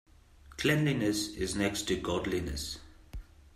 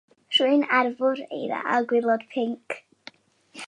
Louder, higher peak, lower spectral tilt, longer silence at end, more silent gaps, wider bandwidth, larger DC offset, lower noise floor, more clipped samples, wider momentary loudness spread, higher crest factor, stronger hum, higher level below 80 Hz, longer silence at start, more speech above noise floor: second, -32 LUFS vs -24 LUFS; second, -14 dBFS vs -6 dBFS; about the same, -4.5 dB/octave vs -4 dB/octave; about the same, 0.05 s vs 0 s; neither; first, 15.5 kHz vs 11.5 kHz; neither; about the same, -56 dBFS vs -53 dBFS; neither; first, 21 LU vs 12 LU; about the same, 20 dB vs 18 dB; neither; first, -48 dBFS vs -82 dBFS; first, 0.45 s vs 0.3 s; second, 25 dB vs 30 dB